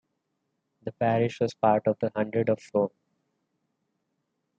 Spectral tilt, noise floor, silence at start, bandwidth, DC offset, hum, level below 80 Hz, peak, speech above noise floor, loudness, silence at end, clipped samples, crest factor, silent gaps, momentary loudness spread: -7.5 dB/octave; -79 dBFS; 0.85 s; 8.4 kHz; under 0.1%; none; -72 dBFS; -10 dBFS; 53 dB; -27 LUFS; 1.7 s; under 0.1%; 20 dB; none; 7 LU